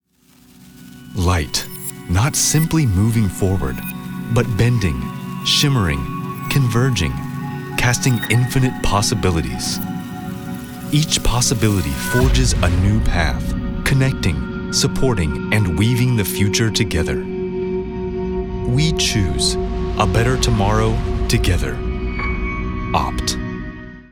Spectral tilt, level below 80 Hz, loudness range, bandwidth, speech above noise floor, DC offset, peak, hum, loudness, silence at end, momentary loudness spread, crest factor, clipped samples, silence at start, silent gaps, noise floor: -4.5 dB/octave; -26 dBFS; 2 LU; over 20 kHz; 35 dB; under 0.1%; -2 dBFS; none; -18 LUFS; 0.1 s; 10 LU; 16 dB; under 0.1%; 0.6 s; none; -51 dBFS